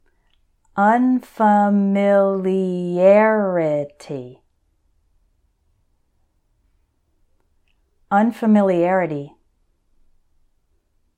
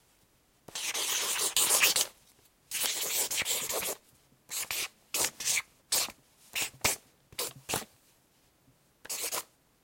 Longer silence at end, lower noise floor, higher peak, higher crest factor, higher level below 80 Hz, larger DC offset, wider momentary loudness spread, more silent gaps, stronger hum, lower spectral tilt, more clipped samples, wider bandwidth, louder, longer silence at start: first, 1.9 s vs 0.4 s; about the same, -64 dBFS vs -67 dBFS; first, -2 dBFS vs -6 dBFS; second, 18 dB vs 28 dB; about the same, -62 dBFS vs -66 dBFS; neither; first, 16 LU vs 13 LU; neither; neither; first, -8.5 dB/octave vs 1 dB/octave; neither; second, 9.2 kHz vs 17 kHz; first, -17 LUFS vs -30 LUFS; about the same, 0.75 s vs 0.7 s